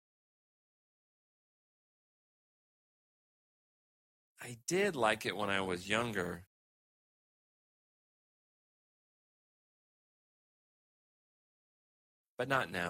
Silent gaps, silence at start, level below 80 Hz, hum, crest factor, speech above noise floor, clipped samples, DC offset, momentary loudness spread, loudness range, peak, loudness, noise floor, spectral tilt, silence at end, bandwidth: 6.47-12.38 s; 4.4 s; -74 dBFS; none; 26 dB; over 55 dB; under 0.1%; under 0.1%; 14 LU; 12 LU; -16 dBFS; -35 LUFS; under -90 dBFS; -4 dB/octave; 0 s; 16 kHz